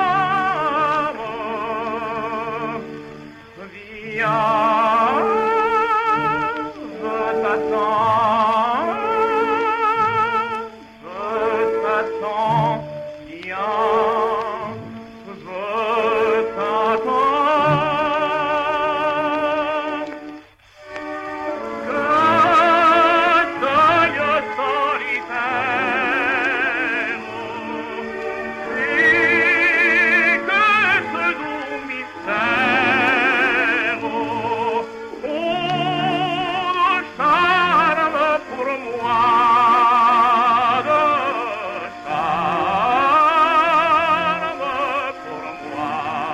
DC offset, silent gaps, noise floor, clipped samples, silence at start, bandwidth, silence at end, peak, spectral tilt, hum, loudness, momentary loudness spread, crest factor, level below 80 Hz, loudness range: under 0.1%; none; -45 dBFS; under 0.1%; 0 s; 13 kHz; 0 s; -4 dBFS; -5 dB/octave; none; -18 LUFS; 15 LU; 14 dB; -56 dBFS; 6 LU